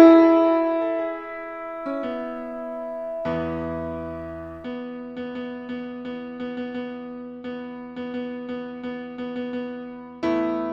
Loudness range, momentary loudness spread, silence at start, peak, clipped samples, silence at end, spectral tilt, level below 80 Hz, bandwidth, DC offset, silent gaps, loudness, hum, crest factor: 7 LU; 12 LU; 0 s; 0 dBFS; under 0.1%; 0 s; -8 dB/octave; -54 dBFS; 5.8 kHz; under 0.1%; none; -26 LUFS; none; 24 dB